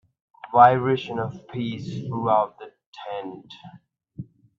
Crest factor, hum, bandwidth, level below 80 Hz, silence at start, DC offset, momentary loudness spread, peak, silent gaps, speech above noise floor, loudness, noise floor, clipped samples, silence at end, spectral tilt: 24 dB; none; 7 kHz; -64 dBFS; 0.45 s; under 0.1%; 26 LU; -2 dBFS; 2.86-2.93 s; 19 dB; -22 LUFS; -42 dBFS; under 0.1%; 0.35 s; -7.5 dB/octave